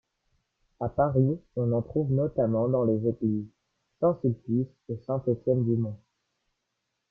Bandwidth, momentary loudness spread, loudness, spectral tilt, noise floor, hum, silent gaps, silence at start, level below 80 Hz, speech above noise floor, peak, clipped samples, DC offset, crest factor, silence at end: 1.8 kHz; 10 LU; -28 LUFS; -13.5 dB/octave; -81 dBFS; none; none; 0.8 s; -58 dBFS; 55 dB; -10 dBFS; under 0.1%; under 0.1%; 18 dB; 1.15 s